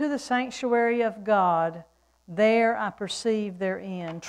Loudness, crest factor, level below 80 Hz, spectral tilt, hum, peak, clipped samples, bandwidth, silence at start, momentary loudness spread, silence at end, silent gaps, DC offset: -25 LUFS; 14 dB; -66 dBFS; -5 dB/octave; none; -10 dBFS; under 0.1%; 11.5 kHz; 0 s; 10 LU; 0 s; none; under 0.1%